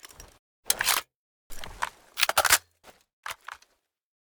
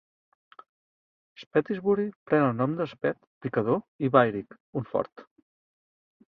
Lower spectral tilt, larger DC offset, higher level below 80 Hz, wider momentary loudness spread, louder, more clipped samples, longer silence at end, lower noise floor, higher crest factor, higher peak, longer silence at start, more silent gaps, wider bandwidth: second, 1.5 dB/octave vs -9.5 dB/octave; neither; first, -54 dBFS vs -68 dBFS; first, 22 LU vs 13 LU; about the same, -25 LUFS vs -27 LUFS; neither; second, 0.7 s vs 1.05 s; second, -66 dBFS vs under -90 dBFS; about the same, 28 dB vs 24 dB; first, -2 dBFS vs -6 dBFS; second, 0.05 s vs 1.4 s; first, 0.39-0.63 s, 1.16-1.50 s, 3.13-3.23 s vs 1.46-1.51 s, 2.16-2.26 s, 3.27-3.41 s, 3.88-3.99 s, 4.60-4.73 s, 5.12-5.16 s; first, over 20 kHz vs 6 kHz